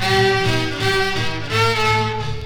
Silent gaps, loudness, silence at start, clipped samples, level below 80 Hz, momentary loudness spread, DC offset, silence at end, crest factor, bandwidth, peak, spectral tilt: none; -18 LUFS; 0 s; under 0.1%; -36 dBFS; 5 LU; under 0.1%; 0 s; 14 dB; 18 kHz; -4 dBFS; -4.5 dB/octave